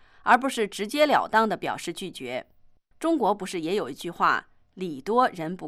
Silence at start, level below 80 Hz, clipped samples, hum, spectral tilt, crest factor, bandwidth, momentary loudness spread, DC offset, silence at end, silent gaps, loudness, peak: 0.25 s; -62 dBFS; under 0.1%; none; -4 dB/octave; 20 dB; 15.5 kHz; 13 LU; under 0.1%; 0 s; none; -25 LUFS; -6 dBFS